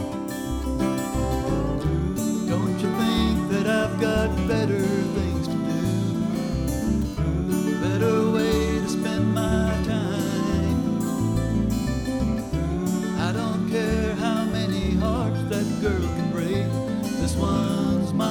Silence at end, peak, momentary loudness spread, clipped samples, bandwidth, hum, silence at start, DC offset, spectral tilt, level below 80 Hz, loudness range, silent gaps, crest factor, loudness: 0 s; -10 dBFS; 4 LU; under 0.1%; over 20 kHz; none; 0 s; under 0.1%; -6.5 dB/octave; -34 dBFS; 2 LU; none; 14 dB; -24 LUFS